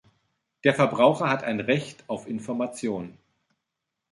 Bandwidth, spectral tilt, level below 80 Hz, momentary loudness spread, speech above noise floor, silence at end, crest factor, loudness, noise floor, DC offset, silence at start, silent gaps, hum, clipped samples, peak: 11.5 kHz; -6 dB/octave; -68 dBFS; 14 LU; 59 dB; 1 s; 22 dB; -25 LUFS; -84 dBFS; under 0.1%; 0.65 s; none; none; under 0.1%; -4 dBFS